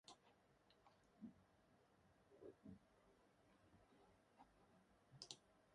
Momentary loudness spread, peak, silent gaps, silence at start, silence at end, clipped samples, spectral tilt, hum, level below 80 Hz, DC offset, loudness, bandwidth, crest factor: 7 LU; -34 dBFS; none; 0.05 s; 0 s; under 0.1%; -3.5 dB/octave; none; -86 dBFS; under 0.1%; -63 LUFS; 10.5 kHz; 34 dB